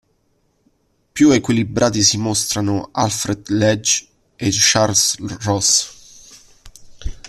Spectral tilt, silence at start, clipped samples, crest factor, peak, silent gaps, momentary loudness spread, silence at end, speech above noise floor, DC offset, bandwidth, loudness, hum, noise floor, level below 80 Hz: -3 dB/octave; 1.15 s; under 0.1%; 18 dB; -2 dBFS; none; 10 LU; 0 s; 46 dB; under 0.1%; 14 kHz; -16 LUFS; none; -63 dBFS; -42 dBFS